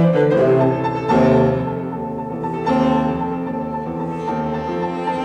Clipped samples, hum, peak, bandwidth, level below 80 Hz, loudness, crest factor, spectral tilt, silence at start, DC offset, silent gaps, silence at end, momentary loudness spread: under 0.1%; none; -4 dBFS; 9 kHz; -46 dBFS; -19 LUFS; 14 dB; -8.5 dB/octave; 0 s; under 0.1%; none; 0 s; 10 LU